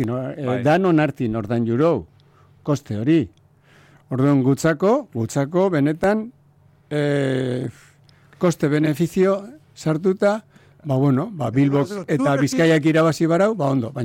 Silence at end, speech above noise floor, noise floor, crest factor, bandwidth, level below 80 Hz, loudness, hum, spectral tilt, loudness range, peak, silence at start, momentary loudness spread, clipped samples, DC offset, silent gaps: 0 s; 35 dB; -54 dBFS; 12 dB; 16.5 kHz; -56 dBFS; -20 LUFS; none; -7 dB/octave; 4 LU; -8 dBFS; 0 s; 9 LU; under 0.1%; under 0.1%; none